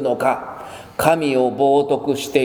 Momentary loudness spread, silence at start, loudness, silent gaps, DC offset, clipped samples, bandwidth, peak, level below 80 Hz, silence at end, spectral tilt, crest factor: 15 LU; 0 s; -18 LUFS; none; under 0.1%; under 0.1%; over 20 kHz; 0 dBFS; -54 dBFS; 0 s; -5 dB/octave; 18 dB